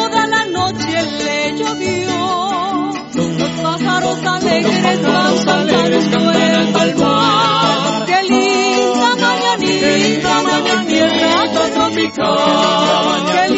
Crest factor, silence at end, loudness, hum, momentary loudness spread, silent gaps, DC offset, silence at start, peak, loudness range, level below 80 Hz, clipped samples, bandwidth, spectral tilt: 14 dB; 0 s; -14 LUFS; none; 5 LU; none; under 0.1%; 0 s; 0 dBFS; 4 LU; -50 dBFS; under 0.1%; 8.2 kHz; -4 dB/octave